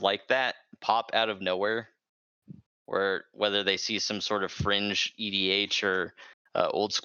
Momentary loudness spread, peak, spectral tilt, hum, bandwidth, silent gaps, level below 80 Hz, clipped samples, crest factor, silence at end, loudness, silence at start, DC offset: 6 LU; -8 dBFS; -3 dB/octave; none; 7.6 kHz; 2.09-2.42 s, 2.66-2.85 s, 6.33-6.45 s; -62 dBFS; under 0.1%; 22 dB; 0.05 s; -28 LUFS; 0 s; under 0.1%